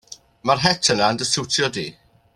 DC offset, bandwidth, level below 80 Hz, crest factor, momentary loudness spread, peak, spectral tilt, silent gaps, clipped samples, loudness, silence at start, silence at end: under 0.1%; 14 kHz; -54 dBFS; 20 dB; 11 LU; -2 dBFS; -2.5 dB/octave; none; under 0.1%; -19 LUFS; 0.1 s; 0.45 s